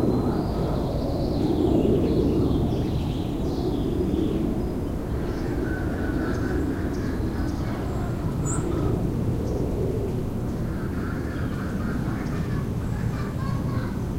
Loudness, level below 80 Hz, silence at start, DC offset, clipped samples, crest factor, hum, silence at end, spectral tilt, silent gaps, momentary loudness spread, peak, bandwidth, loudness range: -26 LUFS; -32 dBFS; 0 s; under 0.1%; under 0.1%; 14 dB; none; 0 s; -7.5 dB/octave; none; 6 LU; -10 dBFS; 16 kHz; 4 LU